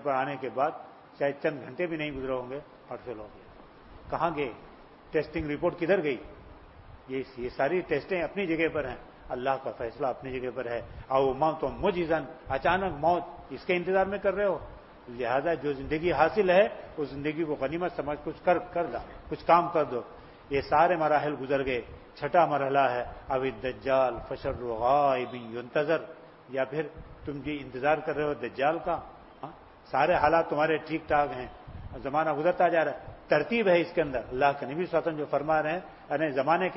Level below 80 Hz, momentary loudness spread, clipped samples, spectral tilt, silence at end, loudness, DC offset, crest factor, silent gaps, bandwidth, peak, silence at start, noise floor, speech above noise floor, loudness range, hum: -52 dBFS; 15 LU; under 0.1%; -9.5 dB/octave; 0 s; -29 LUFS; under 0.1%; 20 dB; none; 5.8 kHz; -8 dBFS; 0 s; -51 dBFS; 22 dB; 5 LU; none